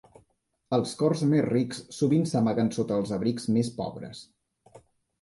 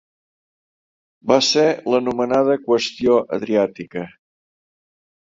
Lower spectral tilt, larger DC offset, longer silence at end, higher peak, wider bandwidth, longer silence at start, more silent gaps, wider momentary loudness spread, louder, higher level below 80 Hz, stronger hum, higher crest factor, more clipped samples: first, -7 dB/octave vs -4 dB/octave; neither; second, 0.45 s vs 1.15 s; second, -12 dBFS vs -2 dBFS; first, 11.5 kHz vs 7.8 kHz; second, 0.7 s vs 1.25 s; neither; second, 11 LU vs 15 LU; second, -27 LUFS vs -18 LUFS; about the same, -62 dBFS vs -60 dBFS; neither; about the same, 16 dB vs 20 dB; neither